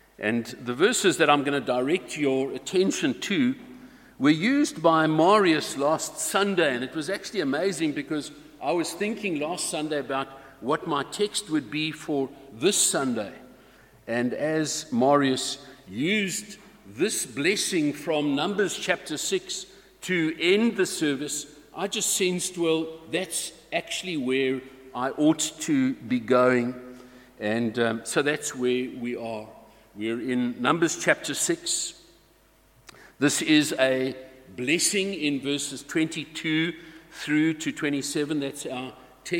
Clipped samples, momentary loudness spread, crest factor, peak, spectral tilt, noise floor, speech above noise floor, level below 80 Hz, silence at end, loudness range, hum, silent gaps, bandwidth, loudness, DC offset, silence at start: under 0.1%; 12 LU; 22 dB; -4 dBFS; -3.5 dB/octave; -59 dBFS; 34 dB; -66 dBFS; 0 s; 5 LU; none; none; 17 kHz; -25 LUFS; under 0.1%; 0.2 s